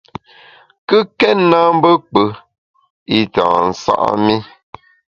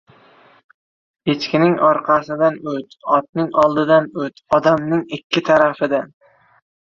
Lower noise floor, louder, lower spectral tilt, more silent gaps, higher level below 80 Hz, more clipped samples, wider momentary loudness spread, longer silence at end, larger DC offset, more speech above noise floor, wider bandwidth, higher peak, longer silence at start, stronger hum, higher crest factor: second, -45 dBFS vs -50 dBFS; first, -14 LUFS vs -17 LUFS; about the same, -6 dB/octave vs -6.5 dB/octave; first, 2.58-2.74 s, 2.90-3.06 s vs 3.29-3.33 s, 5.24-5.30 s; first, -52 dBFS vs -58 dBFS; neither; second, 9 LU vs 12 LU; about the same, 0.7 s vs 0.8 s; neither; about the same, 32 dB vs 33 dB; about the same, 7.4 kHz vs 7.2 kHz; about the same, 0 dBFS vs -2 dBFS; second, 0.9 s vs 1.25 s; neither; about the same, 16 dB vs 16 dB